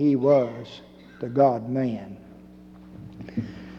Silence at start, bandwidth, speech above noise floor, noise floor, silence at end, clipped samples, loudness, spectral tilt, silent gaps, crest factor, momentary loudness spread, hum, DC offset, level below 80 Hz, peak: 0 s; 6.8 kHz; 23 dB; -47 dBFS; 0 s; under 0.1%; -24 LUFS; -9 dB/octave; none; 18 dB; 24 LU; none; under 0.1%; -58 dBFS; -8 dBFS